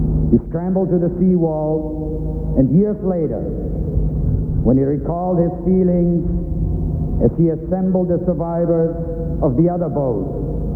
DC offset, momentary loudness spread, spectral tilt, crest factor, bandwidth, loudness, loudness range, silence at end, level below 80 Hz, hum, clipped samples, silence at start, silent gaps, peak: under 0.1%; 7 LU; -13.5 dB/octave; 16 dB; 2.3 kHz; -18 LUFS; 1 LU; 0 s; -26 dBFS; none; under 0.1%; 0 s; none; 0 dBFS